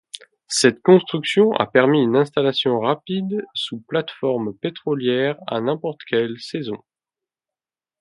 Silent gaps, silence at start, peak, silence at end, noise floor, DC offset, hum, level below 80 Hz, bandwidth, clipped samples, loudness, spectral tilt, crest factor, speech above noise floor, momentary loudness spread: none; 0.15 s; 0 dBFS; 1.25 s; under -90 dBFS; under 0.1%; none; -68 dBFS; 11.5 kHz; under 0.1%; -20 LUFS; -5 dB/octave; 20 dB; over 71 dB; 12 LU